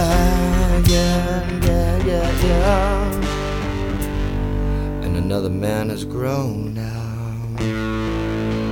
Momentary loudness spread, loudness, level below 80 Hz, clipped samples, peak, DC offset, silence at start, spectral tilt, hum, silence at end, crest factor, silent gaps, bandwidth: 8 LU; -21 LUFS; -24 dBFS; under 0.1%; -2 dBFS; under 0.1%; 0 s; -6 dB/octave; none; 0 s; 16 dB; none; 18 kHz